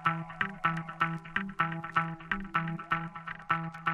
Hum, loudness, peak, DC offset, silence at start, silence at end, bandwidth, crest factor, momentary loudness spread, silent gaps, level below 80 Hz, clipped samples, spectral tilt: none; -33 LUFS; -12 dBFS; under 0.1%; 0 s; 0 s; 8.6 kHz; 20 dB; 4 LU; none; -56 dBFS; under 0.1%; -6.5 dB/octave